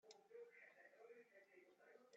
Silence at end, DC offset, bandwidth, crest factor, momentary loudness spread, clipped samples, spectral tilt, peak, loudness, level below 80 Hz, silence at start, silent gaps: 0 s; under 0.1%; 7 kHz; 18 dB; 6 LU; under 0.1%; -0.5 dB/octave; -50 dBFS; -66 LUFS; under -90 dBFS; 0.05 s; none